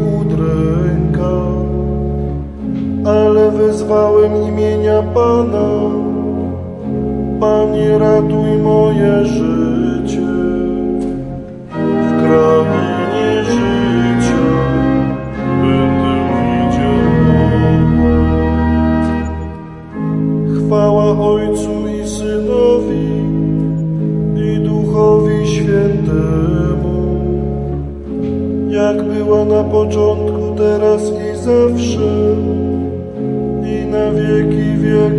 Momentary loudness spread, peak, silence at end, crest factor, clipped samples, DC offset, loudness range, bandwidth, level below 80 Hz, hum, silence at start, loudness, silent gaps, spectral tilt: 8 LU; 0 dBFS; 0 s; 12 dB; under 0.1%; under 0.1%; 3 LU; 11.5 kHz; -28 dBFS; none; 0 s; -14 LUFS; none; -8 dB/octave